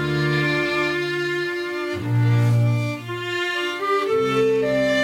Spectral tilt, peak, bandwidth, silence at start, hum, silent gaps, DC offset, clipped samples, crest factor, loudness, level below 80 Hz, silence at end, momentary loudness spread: -6.5 dB/octave; -10 dBFS; 14.5 kHz; 0 s; none; none; under 0.1%; under 0.1%; 12 dB; -21 LUFS; -54 dBFS; 0 s; 7 LU